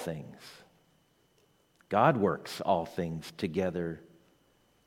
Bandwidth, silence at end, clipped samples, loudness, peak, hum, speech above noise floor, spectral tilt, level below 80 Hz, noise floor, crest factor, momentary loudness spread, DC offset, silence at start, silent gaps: 16.5 kHz; 0.85 s; under 0.1%; -31 LUFS; -10 dBFS; none; 38 dB; -6.5 dB/octave; -64 dBFS; -69 dBFS; 24 dB; 21 LU; under 0.1%; 0 s; none